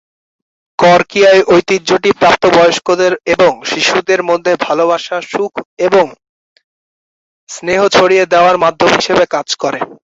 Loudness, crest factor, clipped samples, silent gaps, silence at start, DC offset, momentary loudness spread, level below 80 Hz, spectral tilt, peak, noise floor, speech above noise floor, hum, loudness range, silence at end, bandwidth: -11 LUFS; 12 dB; under 0.1%; 5.65-5.77 s, 6.29-6.56 s, 6.64-7.47 s; 0.8 s; under 0.1%; 10 LU; -50 dBFS; -3.5 dB/octave; 0 dBFS; under -90 dBFS; over 79 dB; none; 6 LU; 0.25 s; 8 kHz